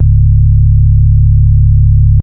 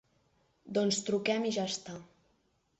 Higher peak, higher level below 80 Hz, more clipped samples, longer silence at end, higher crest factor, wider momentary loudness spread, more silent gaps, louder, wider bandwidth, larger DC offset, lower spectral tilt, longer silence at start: first, 0 dBFS vs -18 dBFS; first, -10 dBFS vs -74 dBFS; neither; second, 0 s vs 0.75 s; second, 6 dB vs 18 dB; second, 0 LU vs 13 LU; neither; first, -8 LUFS vs -32 LUFS; second, 0.4 kHz vs 8.4 kHz; neither; first, -15 dB/octave vs -3.5 dB/octave; second, 0 s vs 0.65 s